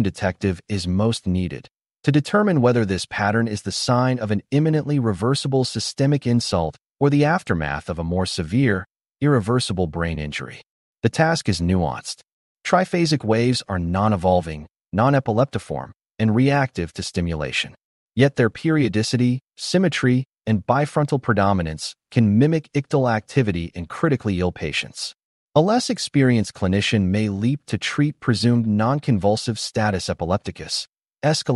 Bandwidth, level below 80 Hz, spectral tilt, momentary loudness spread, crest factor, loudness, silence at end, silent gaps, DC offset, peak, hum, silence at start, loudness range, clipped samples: 11.5 kHz; -46 dBFS; -6 dB/octave; 8 LU; 18 dB; -21 LUFS; 0 s; 6.89-6.94 s, 10.70-10.94 s, 12.33-12.56 s, 17.84-18.07 s, 25.24-25.48 s, 30.89-30.93 s; under 0.1%; -4 dBFS; none; 0 s; 2 LU; under 0.1%